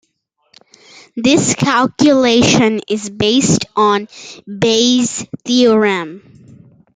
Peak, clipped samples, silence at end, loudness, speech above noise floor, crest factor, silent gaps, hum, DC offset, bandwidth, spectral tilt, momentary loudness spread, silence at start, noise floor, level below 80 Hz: 0 dBFS; under 0.1%; 0.8 s; -13 LUFS; 51 dB; 14 dB; none; none; under 0.1%; 9.6 kHz; -4 dB/octave; 13 LU; 1.15 s; -65 dBFS; -50 dBFS